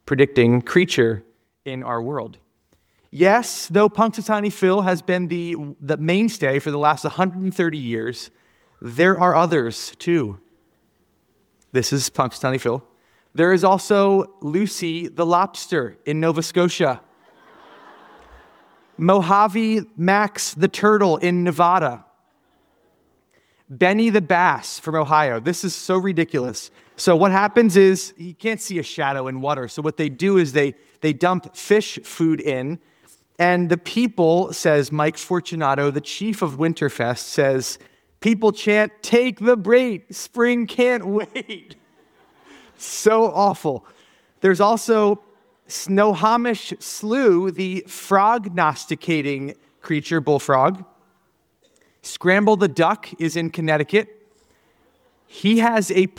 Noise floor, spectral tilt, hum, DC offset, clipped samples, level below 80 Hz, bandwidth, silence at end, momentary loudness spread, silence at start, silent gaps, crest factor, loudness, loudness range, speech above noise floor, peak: -65 dBFS; -5.5 dB/octave; none; under 0.1%; under 0.1%; -64 dBFS; 17 kHz; 0.1 s; 12 LU; 0.05 s; none; 18 dB; -19 LUFS; 4 LU; 46 dB; -2 dBFS